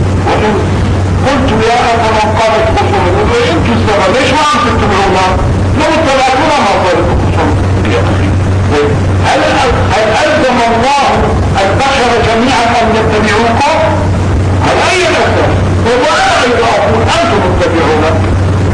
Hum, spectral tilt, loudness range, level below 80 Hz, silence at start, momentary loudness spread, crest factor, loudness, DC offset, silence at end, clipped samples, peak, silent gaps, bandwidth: none; -5.5 dB/octave; 1 LU; -22 dBFS; 0 s; 2 LU; 8 dB; -9 LUFS; under 0.1%; 0 s; under 0.1%; 0 dBFS; none; 10.5 kHz